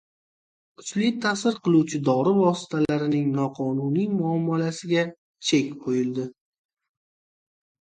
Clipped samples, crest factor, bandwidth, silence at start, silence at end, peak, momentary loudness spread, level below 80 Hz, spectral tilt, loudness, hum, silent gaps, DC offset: under 0.1%; 16 dB; 9.4 kHz; 0.8 s; 1.5 s; -8 dBFS; 8 LU; -66 dBFS; -6 dB/octave; -24 LUFS; none; 5.18-5.34 s; under 0.1%